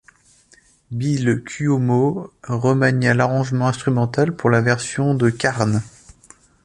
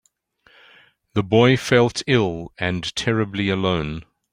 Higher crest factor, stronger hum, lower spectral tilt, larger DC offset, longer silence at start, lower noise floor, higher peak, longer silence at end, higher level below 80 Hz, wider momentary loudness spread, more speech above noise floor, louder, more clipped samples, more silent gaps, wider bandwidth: about the same, 18 dB vs 20 dB; neither; about the same, -6.5 dB/octave vs -5.5 dB/octave; neither; second, 0.9 s vs 1.15 s; second, -54 dBFS vs -59 dBFS; about the same, -2 dBFS vs -2 dBFS; first, 0.75 s vs 0.3 s; about the same, -52 dBFS vs -48 dBFS; about the same, 8 LU vs 10 LU; second, 36 dB vs 40 dB; about the same, -19 LUFS vs -20 LUFS; neither; neither; second, 11.5 kHz vs 16 kHz